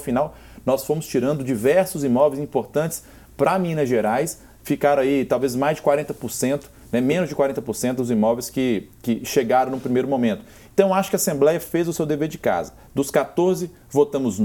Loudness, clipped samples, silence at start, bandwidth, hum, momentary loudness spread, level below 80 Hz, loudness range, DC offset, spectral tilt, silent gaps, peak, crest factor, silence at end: -22 LUFS; under 0.1%; 0 s; 18.5 kHz; none; 8 LU; -52 dBFS; 1 LU; under 0.1%; -5.5 dB/octave; none; -2 dBFS; 20 dB; 0 s